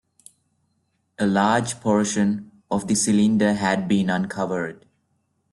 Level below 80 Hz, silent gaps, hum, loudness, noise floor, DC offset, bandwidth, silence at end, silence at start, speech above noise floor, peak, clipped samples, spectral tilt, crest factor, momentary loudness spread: -60 dBFS; none; none; -22 LUFS; -70 dBFS; under 0.1%; 12 kHz; 0.8 s; 1.2 s; 50 dB; -6 dBFS; under 0.1%; -5 dB/octave; 16 dB; 9 LU